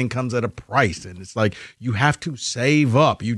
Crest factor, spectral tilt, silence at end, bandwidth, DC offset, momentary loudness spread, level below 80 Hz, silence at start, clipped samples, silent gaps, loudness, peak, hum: 18 dB; -5.5 dB/octave; 0 s; 11.5 kHz; under 0.1%; 11 LU; -50 dBFS; 0 s; under 0.1%; none; -21 LUFS; -2 dBFS; none